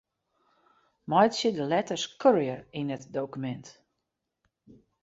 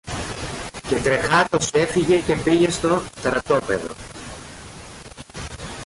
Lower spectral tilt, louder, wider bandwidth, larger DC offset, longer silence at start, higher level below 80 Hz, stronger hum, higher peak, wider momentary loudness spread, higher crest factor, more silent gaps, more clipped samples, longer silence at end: about the same, -5 dB/octave vs -4.5 dB/octave; second, -28 LUFS vs -20 LUFS; second, 8 kHz vs 11.5 kHz; neither; first, 1.1 s vs 0.05 s; second, -72 dBFS vs -42 dBFS; neither; about the same, -8 dBFS vs -6 dBFS; second, 13 LU vs 20 LU; first, 22 dB vs 16 dB; neither; neither; first, 1.35 s vs 0 s